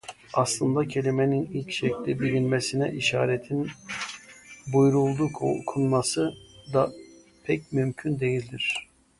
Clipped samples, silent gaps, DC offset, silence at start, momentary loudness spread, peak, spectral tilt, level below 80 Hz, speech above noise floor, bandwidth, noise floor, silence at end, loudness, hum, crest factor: under 0.1%; none; under 0.1%; 0.05 s; 10 LU; -8 dBFS; -5.5 dB/octave; -58 dBFS; 23 dB; 11.5 kHz; -48 dBFS; 0.35 s; -26 LUFS; none; 18 dB